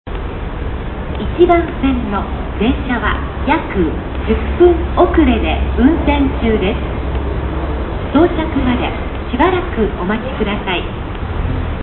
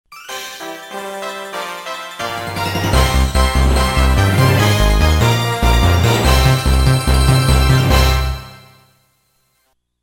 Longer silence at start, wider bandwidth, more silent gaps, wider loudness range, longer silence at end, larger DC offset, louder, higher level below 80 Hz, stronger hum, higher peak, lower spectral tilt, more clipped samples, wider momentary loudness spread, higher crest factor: about the same, 0.05 s vs 0.1 s; second, 4.2 kHz vs 17 kHz; neither; about the same, 3 LU vs 5 LU; second, 0 s vs 1.45 s; neither; about the same, -16 LUFS vs -14 LUFS; about the same, -22 dBFS vs -18 dBFS; neither; about the same, 0 dBFS vs 0 dBFS; first, -10.5 dB/octave vs -5 dB/octave; neither; second, 11 LU vs 14 LU; about the same, 14 dB vs 14 dB